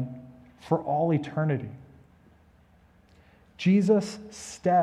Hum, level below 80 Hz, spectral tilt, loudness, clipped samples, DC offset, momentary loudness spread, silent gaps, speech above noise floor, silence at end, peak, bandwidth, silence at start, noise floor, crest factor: none; -62 dBFS; -7 dB/octave; -26 LUFS; under 0.1%; under 0.1%; 19 LU; none; 34 dB; 0 s; -8 dBFS; 11 kHz; 0 s; -59 dBFS; 20 dB